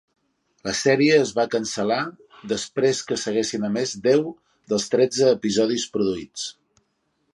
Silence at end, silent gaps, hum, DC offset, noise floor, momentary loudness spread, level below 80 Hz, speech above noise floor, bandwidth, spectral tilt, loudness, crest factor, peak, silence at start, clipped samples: 0.8 s; none; none; under 0.1%; -71 dBFS; 13 LU; -62 dBFS; 49 dB; 11.5 kHz; -4 dB/octave; -22 LUFS; 18 dB; -4 dBFS; 0.65 s; under 0.1%